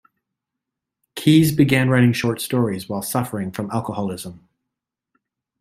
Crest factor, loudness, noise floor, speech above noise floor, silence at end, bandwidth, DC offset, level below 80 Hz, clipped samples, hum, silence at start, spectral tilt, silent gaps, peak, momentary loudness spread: 18 dB; -19 LUFS; -83 dBFS; 65 dB; 1.25 s; 16 kHz; under 0.1%; -56 dBFS; under 0.1%; none; 1.15 s; -6 dB/octave; none; -2 dBFS; 12 LU